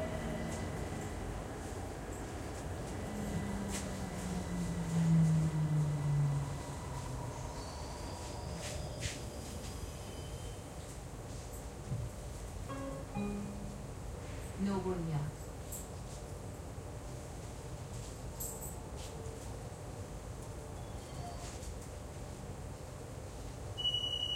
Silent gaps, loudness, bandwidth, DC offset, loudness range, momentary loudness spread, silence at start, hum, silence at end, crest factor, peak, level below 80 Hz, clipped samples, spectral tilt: none; -40 LUFS; 16 kHz; under 0.1%; 11 LU; 13 LU; 0 s; none; 0 s; 18 dB; -20 dBFS; -50 dBFS; under 0.1%; -5 dB/octave